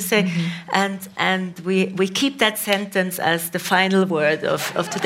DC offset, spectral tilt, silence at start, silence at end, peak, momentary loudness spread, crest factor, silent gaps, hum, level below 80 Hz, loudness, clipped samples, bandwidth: under 0.1%; -4 dB/octave; 0 s; 0 s; -2 dBFS; 5 LU; 20 dB; none; none; -68 dBFS; -20 LUFS; under 0.1%; 16 kHz